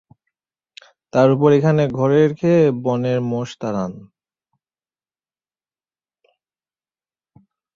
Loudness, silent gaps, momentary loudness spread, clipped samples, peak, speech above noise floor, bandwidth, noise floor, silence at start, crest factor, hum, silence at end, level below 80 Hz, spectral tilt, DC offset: -17 LUFS; none; 11 LU; under 0.1%; -2 dBFS; over 74 dB; 7.4 kHz; under -90 dBFS; 1.15 s; 18 dB; none; 3.7 s; -60 dBFS; -8 dB/octave; under 0.1%